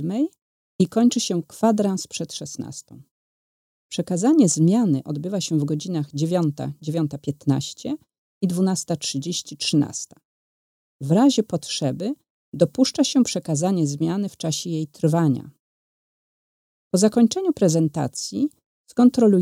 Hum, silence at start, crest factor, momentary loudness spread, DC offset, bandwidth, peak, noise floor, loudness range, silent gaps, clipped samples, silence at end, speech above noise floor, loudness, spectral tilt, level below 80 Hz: none; 0 s; 18 dB; 13 LU; under 0.1%; 16 kHz; -4 dBFS; under -90 dBFS; 4 LU; 0.42-0.79 s, 3.11-3.89 s, 8.18-8.41 s, 10.25-10.99 s, 12.30-12.52 s, 15.60-16.91 s, 18.66-18.84 s; under 0.1%; 0 s; over 69 dB; -22 LUFS; -5.5 dB/octave; -66 dBFS